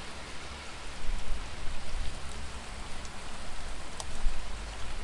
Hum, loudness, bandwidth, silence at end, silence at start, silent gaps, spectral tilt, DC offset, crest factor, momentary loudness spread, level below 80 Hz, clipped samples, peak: none; -41 LUFS; 11.5 kHz; 0 s; 0 s; none; -3.5 dB/octave; under 0.1%; 16 dB; 4 LU; -36 dBFS; under 0.1%; -12 dBFS